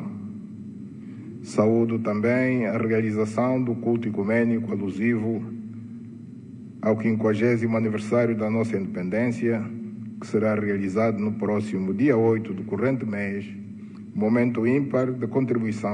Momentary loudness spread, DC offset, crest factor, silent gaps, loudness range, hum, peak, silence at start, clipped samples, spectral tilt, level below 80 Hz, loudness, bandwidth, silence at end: 17 LU; under 0.1%; 18 dB; none; 2 LU; none; -8 dBFS; 0 s; under 0.1%; -8.5 dB/octave; -66 dBFS; -24 LUFS; 10 kHz; 0 s